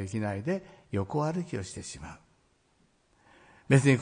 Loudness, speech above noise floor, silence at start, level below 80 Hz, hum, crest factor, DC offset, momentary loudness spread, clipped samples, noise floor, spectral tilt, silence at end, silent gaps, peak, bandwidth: -31 LUFS; 39 dB; 0 s; -62 dBFS; none; 22 dB; under 0.1%; 17 LU; under 0.1%; -68 dBFS; -6.5 dB/octave; 0 s; none; -10 dBFS; 10.5 kHz